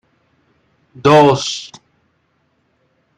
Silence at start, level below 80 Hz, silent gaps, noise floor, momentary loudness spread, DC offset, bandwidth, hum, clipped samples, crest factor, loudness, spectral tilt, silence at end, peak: 1.05 s; -56 dBFS; none; -63 dBFS; 18 LU; under 0.1%; 11.5 kHz; none; under 0.1%; 18 dB; -13 LUFS; -5 dB/octave; 1.5 s; 0 dBFS